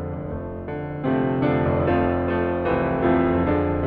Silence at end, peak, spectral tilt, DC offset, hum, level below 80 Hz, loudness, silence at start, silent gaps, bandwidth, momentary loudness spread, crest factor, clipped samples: 0 s; -8 dBFS; -11 dB/octave; under 0.1%; none; -38 dBFS; -22 LUFS; 0 s; none; 4.7 kHz; 11 LU; 14 dB; under 0.1%